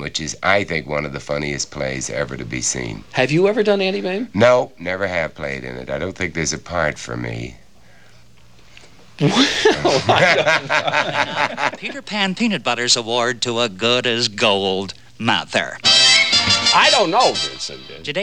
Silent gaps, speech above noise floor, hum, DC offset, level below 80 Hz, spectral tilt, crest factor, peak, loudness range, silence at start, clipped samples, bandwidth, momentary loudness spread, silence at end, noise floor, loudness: none; 31 dB; none; 0.6%; -48 dBFS; -3 dB/octave; 18 dB; 0 dBFS; 10 LU; 0 s; under 0.1%; 13 kHz; 13 LU; 0 s; -50 dBFS; -17 LUFS